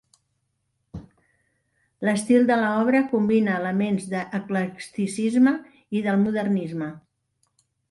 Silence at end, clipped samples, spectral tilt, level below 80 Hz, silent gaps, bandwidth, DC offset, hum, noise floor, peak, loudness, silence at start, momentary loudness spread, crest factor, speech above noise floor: 0.9 s; under 0.1%; -6.5 dB/octave; -62 dBFS; none; 11.5 kHz; under 0.1%; none; -74 dBFS; -8 dBFS; -23 LUFS; 0.95 s; 12 LU; 16 dB; 52 dB